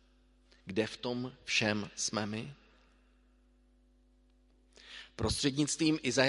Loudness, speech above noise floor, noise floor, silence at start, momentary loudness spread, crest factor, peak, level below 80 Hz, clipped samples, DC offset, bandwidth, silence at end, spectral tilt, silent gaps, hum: -33 LUFS; 33 dB; -66 dBFS; 0.65 s; 18 LU; 26 dB; -12 dBFS; -56 dBFS; under 0.1%; under 0.1%; 11.5 kHz; 0 s; -3.5 dB/octave; none; 50 Hz at -65 dBFS